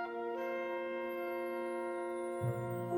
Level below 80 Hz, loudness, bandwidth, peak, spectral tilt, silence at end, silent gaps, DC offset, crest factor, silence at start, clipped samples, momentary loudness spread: -72 dBFS; -39 LUFS; 16.5 kHz; -26 dBFS; -7.5 dB/octave; 0 s; none; under 0.1%; 12 dB; 0 s; under 0.1%; 2 LU